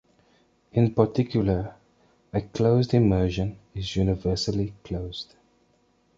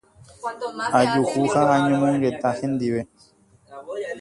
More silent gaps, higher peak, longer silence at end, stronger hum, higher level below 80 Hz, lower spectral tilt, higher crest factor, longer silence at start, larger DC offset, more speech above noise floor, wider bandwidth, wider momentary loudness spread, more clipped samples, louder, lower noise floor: neither; about the same, -4 dBFS vs -4 dBFS; first, 0.95 s vs 0 s; neither; first, -42 dBFS vs -58 dBFS; first, -7.5 dB/octave vs -6 dB/octave; about the same, 22 dB vs 18 dB; first, 0.75 s vs 0.4 s; neither; first, 41 dB vs 24 dB; second, 7.8 kHz vs 11.5 kHz; about the same, 13 LU vs 15 LU; neither; second, -25 LUFS vs -22 LUFS; first, -65 dBFS vs -45 dBFS